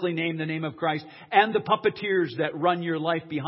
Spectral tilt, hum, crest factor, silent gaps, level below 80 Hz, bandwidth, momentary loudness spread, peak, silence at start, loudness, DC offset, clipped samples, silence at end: -10 dB/octave; none; 22 dB; none; -70 dBFS; 5.8 kHz; 7 LU; -4 dBFS; 0 s; -26 LUFS; under 0.1%; under 0.1%; 0 s